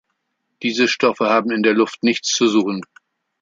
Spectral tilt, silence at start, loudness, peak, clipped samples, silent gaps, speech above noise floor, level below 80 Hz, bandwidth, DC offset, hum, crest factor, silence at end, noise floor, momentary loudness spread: -3.5 dB/octave; 0.6 s; -17 LUFS; 0 dBFS; under 0.1%; none; 56 dB; -68 dBFS; 7.8 kHz; under 0.1%; none; 18 dB; 0.55 s; -73 dBFS; 8 LU